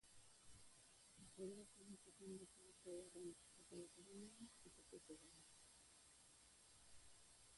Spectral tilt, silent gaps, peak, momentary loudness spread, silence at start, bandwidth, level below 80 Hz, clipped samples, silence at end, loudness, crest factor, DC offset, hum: -4 dB/octave; none; -44 dBFS; 11 LU; 0.05 s; 11.5 kHz; -82 dBFS; under 0.1%; 0 s; -62 LUFS; 18 dB; under 0.1%; none